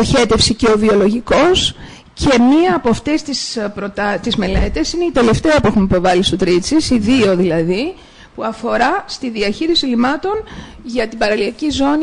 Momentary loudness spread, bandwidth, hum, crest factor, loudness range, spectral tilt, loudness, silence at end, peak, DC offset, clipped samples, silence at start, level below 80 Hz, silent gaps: 10 LU; 10.5 kHz; none; 12 dB; 4 LU; -4.5 dB/octave; -15 LUFS; 0 s; -2 dBFS; under 0.1%; under 0.1%; 0 s; -30 dBFS; none